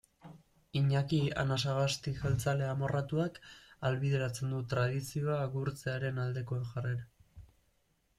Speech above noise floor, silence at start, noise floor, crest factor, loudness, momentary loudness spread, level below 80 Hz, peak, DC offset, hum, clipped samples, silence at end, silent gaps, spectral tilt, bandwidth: 41 dB; 0.25 s; -74 dBFS; 16 dB; -34 LUFS; 7 LU; -58 dBFS; -18 dBFS; under 0.1%; none; under 0.1%; 0.75 s; none; -6 dB/octave; 13.5 kHz